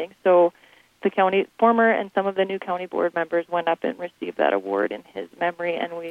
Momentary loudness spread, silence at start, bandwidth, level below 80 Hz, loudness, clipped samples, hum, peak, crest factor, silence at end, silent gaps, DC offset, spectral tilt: 10 LU; 0 s; 5.8 kHz; -72 dBFS; -23 LUFS; under 0.1%; none; -6 dBFS; 18 dB; 0 s; none; under 0.1%; -7 dB/octave